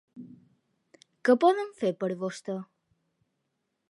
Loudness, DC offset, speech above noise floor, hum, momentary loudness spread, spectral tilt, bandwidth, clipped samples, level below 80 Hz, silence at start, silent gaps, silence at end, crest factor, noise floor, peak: -28 LUFS; under 0.1%; 54 dB; none; 18 LU; -6 dB/octave; 11.5 kHz; under 0.1%; -84 dBFS; 0.15 s; none; 1.25 s; 22 dB; -80 dBFS; -8 dBFS